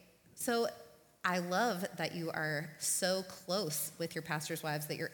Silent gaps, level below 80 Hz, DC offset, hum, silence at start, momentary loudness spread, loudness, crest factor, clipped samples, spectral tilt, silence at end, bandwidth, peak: none; -78 dBFS; under 0.1%; none; 0.35 s; 6 LU; -36 LUFS; 20 dB; under 0.1%; -3 dB/octave; 0 s; 19 kHz; -18 dBFS